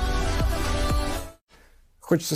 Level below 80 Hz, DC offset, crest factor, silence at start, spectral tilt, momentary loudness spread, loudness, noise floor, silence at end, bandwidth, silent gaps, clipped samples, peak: -28 dBFS; under 0.1%; 16 dB; 0 s; -5 dB/octave; 8 LU; -27 LUFS; -55 dBFS; 0 s; 15.5 kHz; 1.41-1.47 s; under 0.1%; -8 dBFS